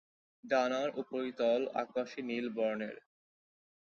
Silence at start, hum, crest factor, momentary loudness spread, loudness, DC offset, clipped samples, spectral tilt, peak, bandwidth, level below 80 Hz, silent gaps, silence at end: 0.45 s; none; 18 dB; 8 LU; -35 LUFS; under 0.1%; under 0.1%; -3 dB/octave; -18 dBFS; 7 kHz; -82 dBFS; none; 0.95 s